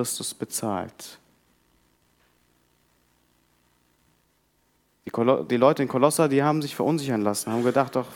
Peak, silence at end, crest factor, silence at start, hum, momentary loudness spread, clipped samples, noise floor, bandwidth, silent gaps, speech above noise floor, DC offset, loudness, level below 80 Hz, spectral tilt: -4 dBFS; 0 s; 22 dB; 0 s; 60 Hz at -60 dBFS; 13 LU; under 0.1%; -67 dBFS; 18.5 kHz; none; 44 dB; under 0.1%; -24 LUFS; -72 dBFS; -5 dB/octave